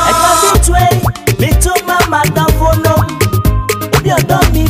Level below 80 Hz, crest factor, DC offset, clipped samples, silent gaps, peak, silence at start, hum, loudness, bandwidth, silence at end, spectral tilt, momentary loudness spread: -16 dBFS; 10 dB; under 0.1%; under 0.1%; none; 0 dBFS; 0 s; none; -11 LUFS; 16 kHz; 0 s; -4.5 dB/octave; 5 LU